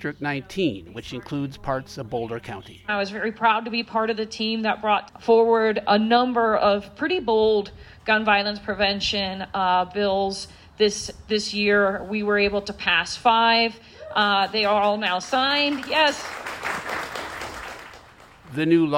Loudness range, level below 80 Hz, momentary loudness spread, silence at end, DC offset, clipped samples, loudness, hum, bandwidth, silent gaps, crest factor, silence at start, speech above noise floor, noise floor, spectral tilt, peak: 5 LU; -52 dBFS; 13 LU; 0 s; under 0.1%; under 0.1%; -22 LUFS; none; 16 kHz; none; 18 dB; 0 s; 26 dB; -48 dBFS; -4 dB/octave; -6 dBFS